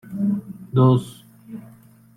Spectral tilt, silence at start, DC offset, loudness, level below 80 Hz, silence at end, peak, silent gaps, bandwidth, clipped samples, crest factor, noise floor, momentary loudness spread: -9.5 dB/octave; 0.05 s; under 0.1%; -20 LUFS; -58 dBFS; 0.55 s; -6 dBFS; none; 12 kHz; under 0.1%; 18 dB; -49 dBFS; 23 LU